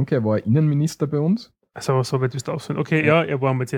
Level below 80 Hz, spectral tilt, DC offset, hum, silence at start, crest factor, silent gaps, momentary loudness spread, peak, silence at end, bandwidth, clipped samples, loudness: -60 dBFS; -7 dB/octave; under 0.1%; none; 0 s; 18 dB; none; 9 LU; -2 dBFS; 0 s; 14 kHz; under 0.1%; -21 LUFS